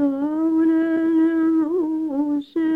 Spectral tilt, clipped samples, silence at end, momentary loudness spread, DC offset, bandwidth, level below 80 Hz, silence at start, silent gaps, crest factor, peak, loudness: -7.5 dB/octave; under 0.1%; 0 s; 5 LU; under 0.1%; 4 kHz; -62 dBFS; 0 s; none; 8 dB; -10 dBFS; -20 LUFS